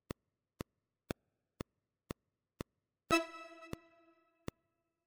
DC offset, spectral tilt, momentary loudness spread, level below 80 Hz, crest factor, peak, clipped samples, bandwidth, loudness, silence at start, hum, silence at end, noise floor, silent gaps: under 0.1%; -4 dB/octave; 18 LU; -64 dBFS; 30 dB; -16 dBFS; under 0.1%; over 20 kHz; -43 LUFS; 3.1 s; none; 1.3 s; -85 dBFS; none